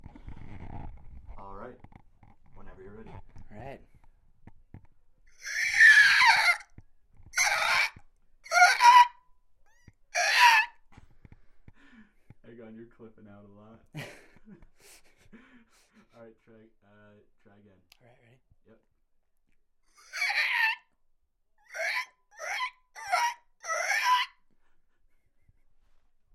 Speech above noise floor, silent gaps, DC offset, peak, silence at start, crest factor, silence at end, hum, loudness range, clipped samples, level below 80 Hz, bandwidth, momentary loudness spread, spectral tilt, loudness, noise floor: 19 dB; none; under 0.1%; -6 dBFS; 0.25 s; 24 dB; 2.1 s; none; 11 LU; under 0.1%; -56 dBFS; 15.5 kHz; 28 LU; 0 dB/octave; -23 LUFS; -69 dBFS